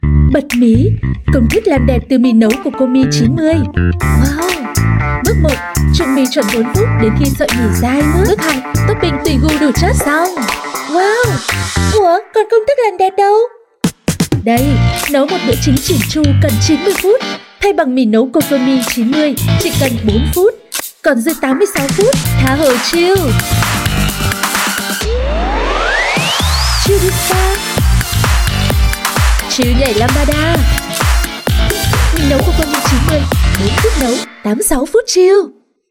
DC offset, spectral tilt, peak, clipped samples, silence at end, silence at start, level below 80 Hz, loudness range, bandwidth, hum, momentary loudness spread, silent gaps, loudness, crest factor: under 0.1%; -5 dB/octave; 0 dBFS; under 0.1%; 0.4 s; 0.05 s; -20 dBFS; 1 LU; 17.5 kHz; none; 4 LU; none; -12 LUFS; 10 dB